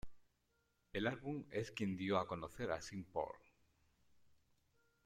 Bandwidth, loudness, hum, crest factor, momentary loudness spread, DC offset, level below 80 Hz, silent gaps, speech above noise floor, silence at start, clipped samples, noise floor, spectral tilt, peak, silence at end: 14.5 kHz; -43 LUFS; none; 22 dB; 8 LU; under 0.1%; -68 dBFS; none; 39 dB; 0.05 s; under 0.1%; -82 dBFS; -6 dB/octave; -22 dBFS; 0.7 s